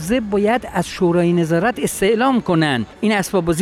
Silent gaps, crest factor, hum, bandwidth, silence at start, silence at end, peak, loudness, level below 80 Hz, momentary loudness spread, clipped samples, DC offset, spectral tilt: none; 10 dB; none; 15.5 kHz; 0 s; 0 s; -6 dBFS; -17 LUFS; -44 dBFS; 4 LU; under 0.1%; under 0.1%; -5.5 dB/octave